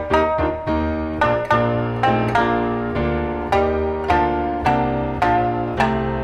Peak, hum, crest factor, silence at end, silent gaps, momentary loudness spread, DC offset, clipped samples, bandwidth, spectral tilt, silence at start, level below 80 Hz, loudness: -2 dBFS; none; 16 dB; 0 s; none; 4 LU; under 0.1%; under 0.1%; 12 kHz; -7.5 dB/octave; 0 s; -32 dBFS; -20 LUFS